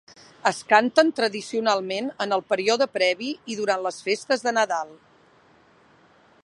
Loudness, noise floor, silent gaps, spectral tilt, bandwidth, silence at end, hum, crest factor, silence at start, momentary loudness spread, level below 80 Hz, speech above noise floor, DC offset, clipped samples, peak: -23 LUFS; -57 dBFS; none; -3 dB/octave; 11.5 kHz; 1.5 s; none; 22 dB; 0.45 s; 9 LU; -76 dBFS; 34 dB; under 0.1%; under 0.1%; -2 dBFS